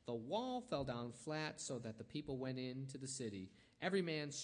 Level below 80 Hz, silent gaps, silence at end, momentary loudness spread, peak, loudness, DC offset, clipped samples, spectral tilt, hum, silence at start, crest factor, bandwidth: -72 dBFS; none; 0 s; 8 LU; -26 dBFS; -45 LUFS; under 0.1%; under 0.1%; -4.5 dB/octave; none; 0.05 s; 18 dB; 10.5 kHz